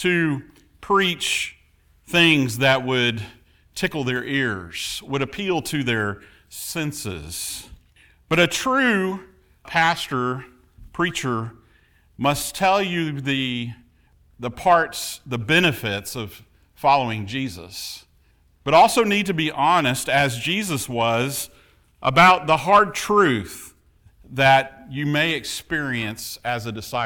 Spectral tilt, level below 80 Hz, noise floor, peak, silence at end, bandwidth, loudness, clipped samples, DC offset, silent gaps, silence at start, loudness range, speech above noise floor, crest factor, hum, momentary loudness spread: -4 dB/octave; -52 dBFS; -58 dBFS; -4 dBFS; 0 s; over 20 kHz; -21 LUFS; under 0.1%; under 0.1%; none; 0 s; 6 LU; 37 dB; 18 dB; none; 16 LU